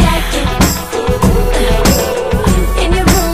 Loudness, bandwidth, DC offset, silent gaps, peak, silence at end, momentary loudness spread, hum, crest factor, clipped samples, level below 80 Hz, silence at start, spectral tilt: -13 LUFS; 15.5 kHz; under 0.1%; none; 0 dBFS; 0 s; 4 LU; none; 12 dB; under 0.1%; -16 dBFS; 0 s; -4.5 dB/octave